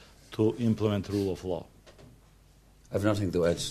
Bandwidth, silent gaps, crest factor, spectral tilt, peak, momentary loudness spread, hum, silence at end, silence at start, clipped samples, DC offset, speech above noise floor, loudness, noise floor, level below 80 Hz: 14 kHz; none; 18 dB; -6.5 dB/octave; -12 dBFS; 9 LU; none; 0 s; 0 s; under 0.1%; under 0.1%; 30 dB; -29 LUFS; -58 dBFS; -54 dBFS